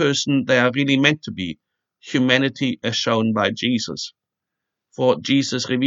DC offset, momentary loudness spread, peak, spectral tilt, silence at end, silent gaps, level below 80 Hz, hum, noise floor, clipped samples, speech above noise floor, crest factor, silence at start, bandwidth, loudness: under 0.1%; 12 LU; 0 dBFS; -4.5 dB/octave; 0 s; none; -66 dBFS; none; -83 dBFS; under 0.1%; 63 dB; 20 dB; 0 s; 7.8 kHz; -19 LUFS